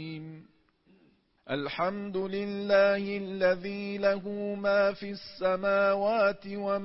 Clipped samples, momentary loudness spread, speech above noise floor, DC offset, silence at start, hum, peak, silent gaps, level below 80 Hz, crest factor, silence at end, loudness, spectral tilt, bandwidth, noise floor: under 0.1%; 11 LU; 37 dB; under 0.1%; 0 s; none; -12 dBFS; none; -66 dBFS; 16 dB; 0 s; -29 LUFS; -9 dB/octave; 5.8 kHz; -66 dBFS